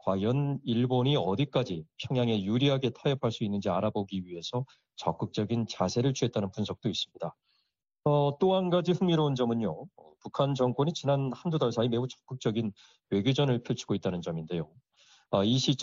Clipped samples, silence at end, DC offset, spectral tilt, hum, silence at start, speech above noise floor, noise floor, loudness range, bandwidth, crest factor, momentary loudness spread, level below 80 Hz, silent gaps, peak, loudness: under 0.1%; 0 s; under 0.1%; -6 dB/octave; none; 0.05 s; 49 dB; -78 dBFS; 3 LU; 7.6 kHz; 18 dB; 10 LU; -66 dBFS; none; -12 dBFS; -30 LUFS